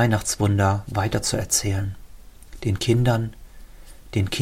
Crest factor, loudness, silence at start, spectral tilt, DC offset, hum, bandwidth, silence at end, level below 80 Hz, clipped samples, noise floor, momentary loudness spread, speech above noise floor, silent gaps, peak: 18 dB; -23 LUFS; 0 s; -4.5 dB/octave; under 0.1%; none; 16.5 kHz; 0 s; -42 dBFS; under 0.1%; -42 dBFS; 10 LU; 21 dB; none; -6 dBFS